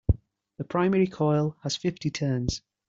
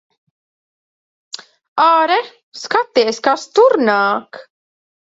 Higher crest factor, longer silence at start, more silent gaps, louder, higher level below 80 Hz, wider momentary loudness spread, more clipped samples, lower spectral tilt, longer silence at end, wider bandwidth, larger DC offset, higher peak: about the same, 18 dB vs 16 dB; second, 0.1 s vs 1.35 s; second, none vs 1.68-1.76 s, 2.43-2.52 s; second, -27 LUFS vs -15 LUFS; first, -42 dBFS vs -70 dBFS; second, 7 LU vs 21 LU; neither; first, -6 dB/octave vs -3 dB/octave; second, 0.3 s vs 0.65 s; about the same, 7.8 kHz vs 8 kHz; neither; second, -8 dBFS vs 0 dBFS